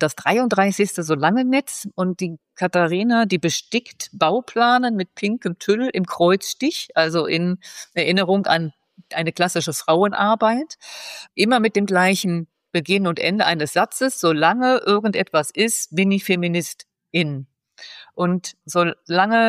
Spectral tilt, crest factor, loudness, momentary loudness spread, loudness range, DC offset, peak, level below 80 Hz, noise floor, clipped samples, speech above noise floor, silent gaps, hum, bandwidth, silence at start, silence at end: -4.5 dB/octave; 16 dB; -20 LUFS; 11 LU; 2 LU; under 0.1%; -4 dBFS; -70 dBFS; -43 dBFS; under 0.1%; 23 dB; none; none; 15.5 kHz; 0 s; 0 s